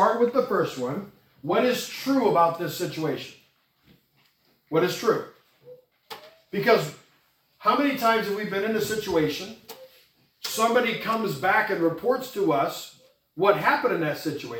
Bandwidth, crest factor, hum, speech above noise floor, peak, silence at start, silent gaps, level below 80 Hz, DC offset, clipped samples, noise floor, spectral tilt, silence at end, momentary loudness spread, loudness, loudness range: 18 kHz; 20 dB; none; 41 dB; -6 dBFS; 0 s; none; -66 dBFS; under 0.1%; under 0.1%; -65 dBFS; -4.5 dB/octave; 0 s; 18 LU; -25 LUFS; 5 LU